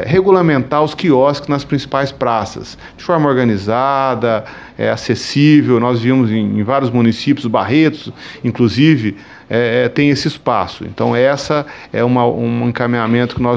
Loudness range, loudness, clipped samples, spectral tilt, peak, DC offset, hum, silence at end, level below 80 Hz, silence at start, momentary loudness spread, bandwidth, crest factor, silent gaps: 3 LU; -14 LUFS; under 0.1%; -7 dB/octave; 0 dBFS; under 0.1%; none; 0 s; -46 dBFS; 0 s; 9 LU; 8 kHz; 14 dB; none